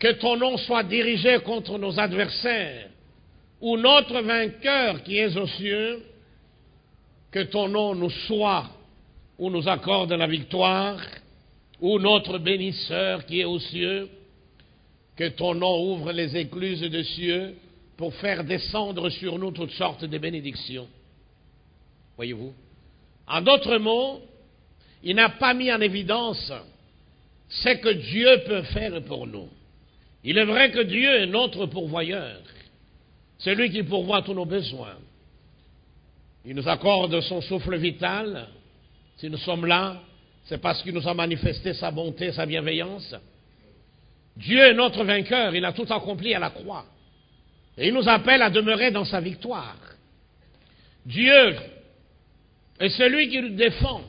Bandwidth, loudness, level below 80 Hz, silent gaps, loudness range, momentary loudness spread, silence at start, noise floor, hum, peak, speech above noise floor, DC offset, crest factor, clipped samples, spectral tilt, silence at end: 5.2 kHz; -23 LUFS; -50 dBFS; none; 7 LU; 17 LU; 0 s; -58 dBFS; none; 0 dBFS; 34 dB; under 0.1%; 24 dB; under 0.1%; -9 dB/octave; 0 s